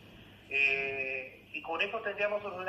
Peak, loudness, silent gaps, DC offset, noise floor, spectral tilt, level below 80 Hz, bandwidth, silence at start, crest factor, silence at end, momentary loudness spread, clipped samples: -16 dBFS; -32 LUFS; none; under 0.1%; -54 dBFS; -4 dB/octave; -68 dBFS; 14.5 kHz; 0 s; 18 dB; 0 s; 12 LU; under 0.1%